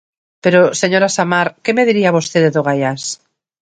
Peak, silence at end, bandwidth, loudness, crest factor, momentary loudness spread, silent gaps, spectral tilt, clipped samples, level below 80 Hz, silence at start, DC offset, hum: 0 dBFS; 0.45 s; 9.4 kHz; -14 LUFS; 14 dB; 8 LU; none; -4.5 dB/octave; under 0.1%; -60 dBFS; 0.45 s; under 0.1%; none